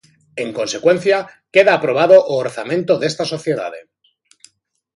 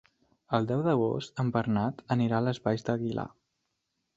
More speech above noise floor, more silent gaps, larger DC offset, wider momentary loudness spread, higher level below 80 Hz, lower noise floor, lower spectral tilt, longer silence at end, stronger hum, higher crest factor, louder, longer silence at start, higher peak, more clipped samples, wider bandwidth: second, 47 dB vs 52 dB; neither; neither; first, 13 LU vs 5 LU; about the same, -66 dBFS vs -62 dBFS; second, -62 dBFS vs -81 dBFS; second, -4.5 dB/octave vs -8 dB/octave; first, 1.15 s vs 0.9 s; neither; second, 16 dB vs 22 dB; first, -16 LUFS vs -30 LUFS; second, 0.35 s vs 0.5 s; first, 0 dBFS vs -10 dBFS; neither; first, 11.5 kHz vs 7.8 kHz